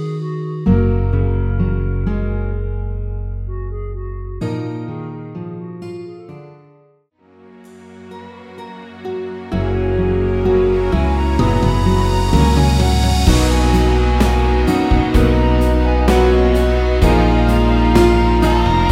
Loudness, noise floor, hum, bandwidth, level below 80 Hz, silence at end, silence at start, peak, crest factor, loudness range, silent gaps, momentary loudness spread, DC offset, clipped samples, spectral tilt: -16 LUFS; -53 dBFS; none; 15 kHz; -20 dBFS; 0 s; 0 s; 0 dBFS; 16 dB; 19 LU; none; 17 LU; under 0.1%; under 0.1%; -7 dB/octave